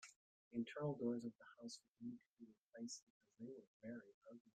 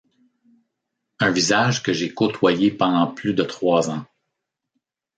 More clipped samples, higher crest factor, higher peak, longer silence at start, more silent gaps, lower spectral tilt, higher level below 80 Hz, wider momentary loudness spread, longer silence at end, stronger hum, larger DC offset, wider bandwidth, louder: neither; about the same, 20 dB vs 18 dB; second, -32 dBFS vs -4 dBFS; second, 0 s vs 1.2 s; first, 0.16-0.51 s, 1.88-1.95 s, 2.29-2.37 s, 2.57-2.70 s, 3.03-3.21 s, 3.67-3.80 s, 4.14-4.22 s, 4.40-4.45 s vs none; about the same, -5.5 dB/octave vs -4.5 dB/octave; second, -90 dBFS vs -62 dBFS; first, 18 LU vs 5 LU; second, 0.1 s vs 1.15 s; neither; neither; about the same, 9.4 kHz vs 9.4 kHz; second, -51 LUFS vs -20 LUFS